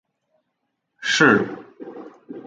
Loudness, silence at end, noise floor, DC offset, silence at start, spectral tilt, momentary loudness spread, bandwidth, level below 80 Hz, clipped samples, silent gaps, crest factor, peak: -18 LUFS; 0.05 s; -76 dBFS; under 0.1%; 1 s; -4 dB/octave; 24 LU; 9.4 kHz; -66 dBFS; under 0.1%; none; 22 dB; -2 dBFS